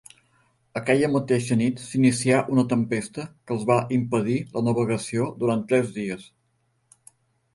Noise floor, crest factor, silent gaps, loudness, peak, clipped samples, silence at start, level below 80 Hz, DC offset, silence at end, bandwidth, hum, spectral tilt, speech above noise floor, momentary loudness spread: -70 dBFS; 20 dB; none; -23 LUFS; -4 dBFS; under 0.1%; 0.75 s; -60 dBFS; under 0.1%; 1.35 s; 11.5 kHz; none; -6 dB/octave; 47 dB; 10 LU